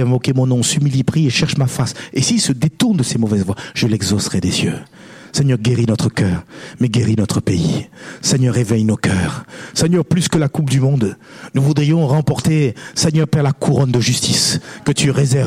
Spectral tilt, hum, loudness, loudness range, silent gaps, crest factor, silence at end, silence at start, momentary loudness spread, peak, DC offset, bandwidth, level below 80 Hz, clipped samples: -5 dB/octave; none; -16 LUFS; 2 LU; none; 12 dB; 0 s; 0 s; 6 LU; -4 dBFS; under 0.1%; 15.5 kHz; -44 dBFS; under 0.1%